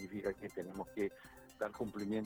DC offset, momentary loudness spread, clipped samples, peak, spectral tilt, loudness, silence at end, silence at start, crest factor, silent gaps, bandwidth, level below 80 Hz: under 0.1%; 7 LU; under 0.1%; -24 dBFS; -6.5 dB/octave; -43 LUFS; 0 s; 0 s; 18 dB; none; over 20 kHz; -68 dBFS